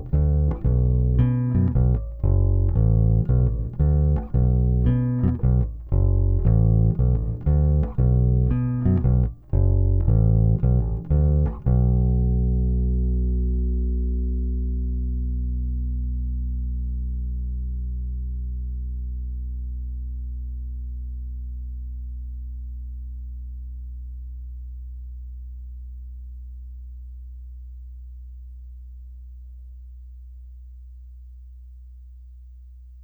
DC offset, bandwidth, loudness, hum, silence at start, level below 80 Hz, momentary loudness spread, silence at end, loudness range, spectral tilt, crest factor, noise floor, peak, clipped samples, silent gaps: under 0.1%; 2.5 kHz; -23 LUFS; none; 0 s; -26 dBFS; 22 LU; 0 s; 21 LU; -13.5 dB/octave; 16 dB; -43 dBFS; -8 dBFS; under 0.1%; none